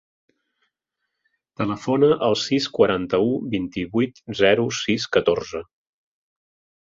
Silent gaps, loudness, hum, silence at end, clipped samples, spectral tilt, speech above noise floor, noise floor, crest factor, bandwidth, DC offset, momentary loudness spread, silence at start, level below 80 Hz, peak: none; -21 LUFS; none; 1.2 s; under 0.1%; -5 dB/octave; 59 dB; -80 dBFS; 22 dB; 7.6 kHz; under 0.1%; 8 LU; 1.6 s; -54 dBFS; -2 dBFS